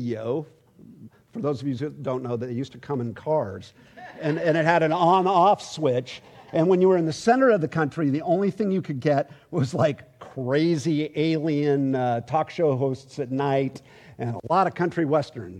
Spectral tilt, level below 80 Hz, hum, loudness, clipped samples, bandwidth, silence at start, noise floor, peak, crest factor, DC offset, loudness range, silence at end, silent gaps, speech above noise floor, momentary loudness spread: -7 dB/octave; -66 dBFS; none; -24 LUFS; under 0.1%; 11 kHz; 0 s; -48 dBFS; -6 dBFS; 18 dB; under 0.1%; 8 LU; 0 s; none; 24 dB; 12 LU